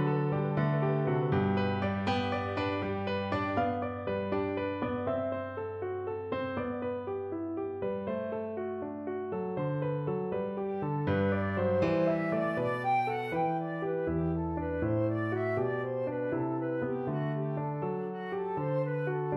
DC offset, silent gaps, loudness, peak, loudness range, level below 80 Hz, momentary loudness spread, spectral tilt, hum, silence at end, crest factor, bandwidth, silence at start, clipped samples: under 0.1%; none; -32 LUFS; -16 dBFS; 5 LU; -58 dBFS; 7 LU; -9 dB/octave; none; 0 s; 16 dB; 7 kHz; 0 s; under 0.1%